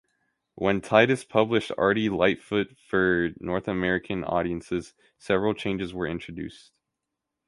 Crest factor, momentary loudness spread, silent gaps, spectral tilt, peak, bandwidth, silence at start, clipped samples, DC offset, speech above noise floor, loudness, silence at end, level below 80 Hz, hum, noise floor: 24 dB; 10 LU; none; -6 dB/octave; -4 dBFS; 11.5 kHz; 0.6 s; under 0.1%; under 0.1%; 59 dB; -26 LUFS; 0.9 s; -52 dBFS; none; -84 dBFS